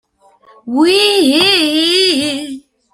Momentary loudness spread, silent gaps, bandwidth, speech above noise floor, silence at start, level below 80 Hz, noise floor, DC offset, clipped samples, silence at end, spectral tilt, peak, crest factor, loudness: 13 LU; none; 15.5 kHz; 37 dB; 0.65 s; -56 dBFS; -48 dBFS; under 0.1%; under 0.1%; 0.35 s; -2 dB/octave; 0 dBFS; 14 dB; -11 LUFS